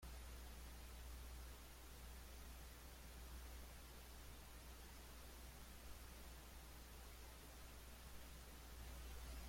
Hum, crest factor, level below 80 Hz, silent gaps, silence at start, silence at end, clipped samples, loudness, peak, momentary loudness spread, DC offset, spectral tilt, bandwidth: none; 12 dB; -58 dBFS; none; 0 s; 0 s; under 0.1%; -59 LUFS; -44 dBFS; 2 LU; under 0.1%; -3.5 dB/octave; 16.5 kHz